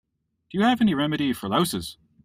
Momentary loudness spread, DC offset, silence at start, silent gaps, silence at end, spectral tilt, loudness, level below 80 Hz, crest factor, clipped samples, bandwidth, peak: 12 LU; under 0.1%; 0.55 s; none; 0.3 s; -5 dB/octave; -24 LUFS; -56 dBFS; 16 dB; under 0.1%; 16 kHz; -10 dBFS